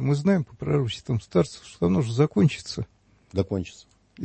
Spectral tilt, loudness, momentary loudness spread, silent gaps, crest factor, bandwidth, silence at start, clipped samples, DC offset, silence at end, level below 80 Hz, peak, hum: -7 dB/octave; -25 LUFS; 11 LU; none; 16 dB; 8.8 kHz; 0 s; under 0.1%; under 0.1%; 0 s; -52 dBFS; -8 dBFS; none